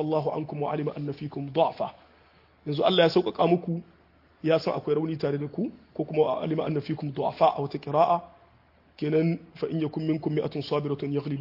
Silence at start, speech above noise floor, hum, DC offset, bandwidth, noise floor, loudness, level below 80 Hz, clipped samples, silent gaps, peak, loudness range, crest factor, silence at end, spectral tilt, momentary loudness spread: 0 s; 33 dB; none; under 0.1%; 5.8 kHz; -60 dBFS; -27 LUFS; -66 dBFS; under 0.1%; none; -8 dBFS; 2 LU; 20 dB; 0 s; -8.5 dB/octave; 10 LU